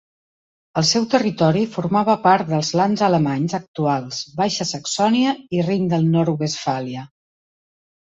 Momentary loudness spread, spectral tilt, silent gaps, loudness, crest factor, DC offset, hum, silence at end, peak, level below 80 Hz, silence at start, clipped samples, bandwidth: 7 LU; -5 dB/octave; 3.68-3.74 s; -19 LUFS; 16 dB; under 0.1%; none; 1.05 s; -4 dBFS; -60 dBFS; 0.75 s; under 0.1%; 8 kHz